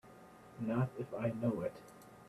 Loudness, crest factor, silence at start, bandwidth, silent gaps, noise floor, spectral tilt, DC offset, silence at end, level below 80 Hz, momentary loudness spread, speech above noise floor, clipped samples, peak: -39 LUFS; 18 dB; 0.05 s; 13.5 kHz; none; -58 dBFS; -9 dB/octave; under 0.1%; 0 s; -70 dBFS; 20 LU; 20 dB; under 0.1%; -22 dBFS